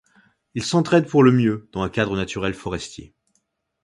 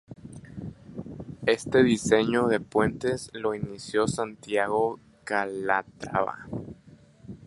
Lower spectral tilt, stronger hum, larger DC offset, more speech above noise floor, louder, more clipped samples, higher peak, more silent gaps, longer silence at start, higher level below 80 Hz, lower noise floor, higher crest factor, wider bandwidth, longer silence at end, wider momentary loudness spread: about the same, -6 dB/octave vs -5 dB/octave; neither; neither; first, 51 dB vs 28 dB; first, -20 LUFS vs -26 LUFS; neither; first, -2 dBFS vs -6 dBFS; neither; first, 0.55 s vs 0.1 s; first, -48 dBFS vs -56 dBFS; first, -71 dBFS vs -54 dBFS; about the same, 20 dB vs 20 dB; about the same, 11.5 kHz vs 11.5 kHz; first, 0.8 s vs 0 s; second, 16 LU vs 19 LU